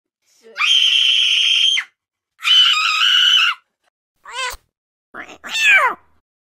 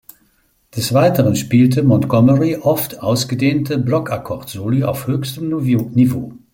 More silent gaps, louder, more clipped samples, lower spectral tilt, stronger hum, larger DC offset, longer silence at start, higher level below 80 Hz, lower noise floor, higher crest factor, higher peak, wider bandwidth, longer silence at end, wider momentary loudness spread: first, 3.90-4.15 s, 4.77-5.14 s vs none; first, -12 LUFS vs -16 LUFS; neither; second, 3 dB/octave vs -6.5 dB/octave; neither; neither; second, 0.55 s vs 0.75 s; second, -56 dBFS vs -50 dBFS; second, -49 dBFS vs -59 dBFS; about the same, 16 dB vs 14 dB; about the same, -2 dBFS vs -2 dBFS; about the same, 16 kHz vs 17 kHz; first, 0.5 s vs 0.15 s; first, 16 LU vs 11 LU